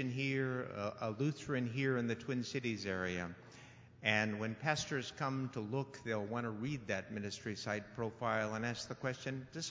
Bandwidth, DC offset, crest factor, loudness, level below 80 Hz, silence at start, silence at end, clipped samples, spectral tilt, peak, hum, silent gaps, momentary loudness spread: 7.8 kHz; under 0.1%; 24 dB; -39 LUFS; -68 dBFS; 0 s; 0 s; under 0.1%; -5 dB/octave; -16 dBFS; none; none; 7 LU